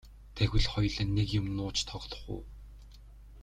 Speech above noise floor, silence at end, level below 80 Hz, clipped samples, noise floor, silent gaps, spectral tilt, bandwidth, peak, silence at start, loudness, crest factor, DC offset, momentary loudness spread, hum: 20 dB; 0 s; -40 dBFS; under 0.1%; -51 dBFS; none; -5 dB/octave; 10.5 kHz; -14 dBFS; 0.05 s; -33 LUFS; 20 dB; under 0.1%; 20 LU; 50 Hz at -45 dBFS